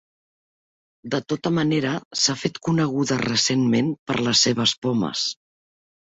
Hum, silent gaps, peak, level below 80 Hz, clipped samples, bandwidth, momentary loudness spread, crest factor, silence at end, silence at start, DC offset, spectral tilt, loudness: none; 2.05-2.11 s, 3.99-4.06 s; -6 dBFS; -60 dBFS; under 0.1%; 8.2 kHz; 8 LU; 18 dB; 0.8 s; 1.05 s; under 0.1%; -4 dB/octave; -22 LUFS